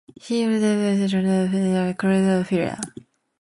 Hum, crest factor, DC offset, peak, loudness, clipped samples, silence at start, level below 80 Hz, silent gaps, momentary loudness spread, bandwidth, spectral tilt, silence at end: none; 16 dB; under 0.1%; -6 dBFS; -21 LUFS; under 0.1%; 0.25 s; -58 dBFS; none; 7 LU; 11.5 kHz; -6.5 dB/octave; 0.5 s